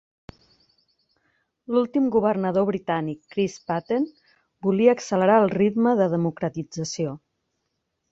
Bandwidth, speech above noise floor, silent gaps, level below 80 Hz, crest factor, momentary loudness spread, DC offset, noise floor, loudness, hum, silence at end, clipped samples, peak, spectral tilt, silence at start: 8 kHz; 55 dB; none; -64 dBFS; 20 dB; 11 LU; under 0.1%; -77 dBFS; -23 LUFS; none; 0.95 s; under 0.1%; -4 dBFS; -6.5 dB/octave; 1.7 s